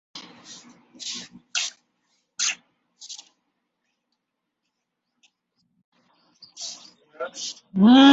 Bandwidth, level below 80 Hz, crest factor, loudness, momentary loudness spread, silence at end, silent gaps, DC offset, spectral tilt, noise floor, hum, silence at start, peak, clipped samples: 8 kHz; -70 dBFS; 22 dB; -24 LUFS; 24 LU; 0 s; 5.84-5.92 s; under 0.1%; -3.5 dB/octave; -81 dBFS; none; 0.15 s; -2 dBFS; under 0.1%